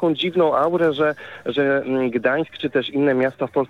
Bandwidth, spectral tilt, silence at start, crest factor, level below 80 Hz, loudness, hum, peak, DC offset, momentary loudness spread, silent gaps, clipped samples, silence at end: 10 kHz; -7 dB/octave; 0 s; 14 dB; -64 dBFS; -20 LUFS; none; -6 dBFS; 0.1%; 5 LU; none; under 0.1%; 0.05 s